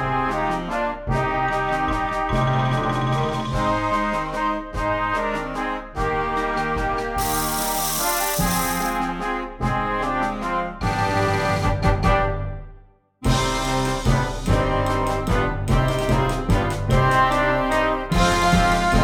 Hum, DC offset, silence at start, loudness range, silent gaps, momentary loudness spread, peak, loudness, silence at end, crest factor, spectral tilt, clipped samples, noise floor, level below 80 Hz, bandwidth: none; under 0.1%; 0 s; 3 LU; none; 7 LU; -4 dBFS; -22 LUFS; 0 s; 16 dB; -5 dB/octave; under 0.1%; -48 dBFS; -30 dBFS; over 20 kHz